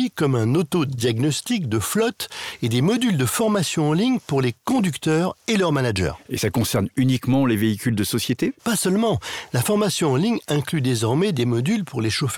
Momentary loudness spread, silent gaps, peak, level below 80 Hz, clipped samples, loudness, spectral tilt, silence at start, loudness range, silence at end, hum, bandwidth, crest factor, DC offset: 4 LU; none; -8 dBFS; -54 dBFS; under 0.1%; -21 LUFS; -5.5 dB/octave; 0 s; 1 LU; 0 s; none; 19 kHz; 12 dB; under 0.1%